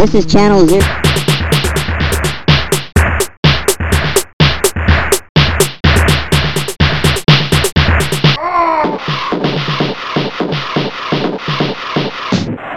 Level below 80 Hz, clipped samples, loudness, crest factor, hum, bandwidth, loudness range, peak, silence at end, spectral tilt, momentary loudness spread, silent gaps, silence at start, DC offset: -22 dBFS; under 0.1%; -12 LUFS; 12 dB; none; 16.5 kHz; 5 LU; 0 dBFS; 0 s; -4.5 dB/octave; 7 LU; 3.37-3.43 s, 4.33-4.39 s, 5.29-5.35 s; 0 s; 3%